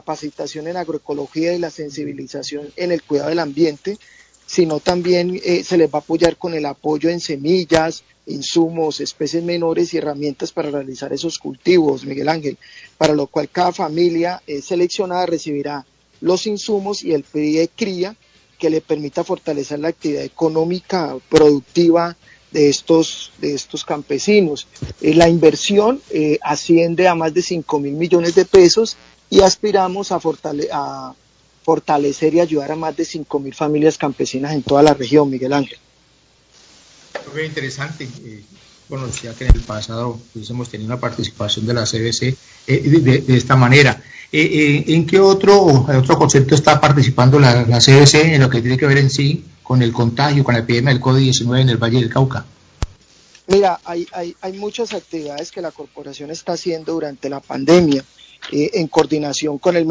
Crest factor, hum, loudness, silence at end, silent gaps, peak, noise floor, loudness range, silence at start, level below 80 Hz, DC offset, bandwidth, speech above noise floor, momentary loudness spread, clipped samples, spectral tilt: 16 dB; none; -16 LUFS; 0 s; none; 0 dBFS; -54 dBFS; 10 LU; 0.05 s; -36 dBFS; under 0.1%; 8 kHz; 38 dB; 15 LU; 0.1%; -5.5 dB/octave